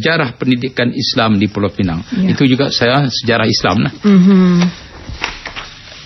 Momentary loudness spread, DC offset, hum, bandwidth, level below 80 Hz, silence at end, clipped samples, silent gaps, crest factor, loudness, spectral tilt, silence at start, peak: 14 LU; under 0.1%; none; 6.2 kHz; -40 dBFS; 0 s; under 0.1%; none; 12 dB; -13 LUFS; -6 dB/octave; 0 s; 0 dBFS